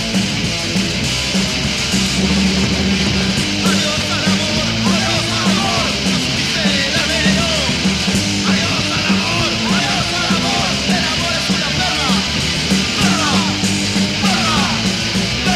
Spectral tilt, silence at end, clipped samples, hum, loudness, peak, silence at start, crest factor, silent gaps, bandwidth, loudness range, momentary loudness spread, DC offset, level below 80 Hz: -3.5 dB/octave; 0 s; under 0.1%; none; -15 LUFS; 0 dBFS; 0 s; 16 dB; none; 15 kHz; 1 LU; 2 LU; under 0.1%; -32 dBFS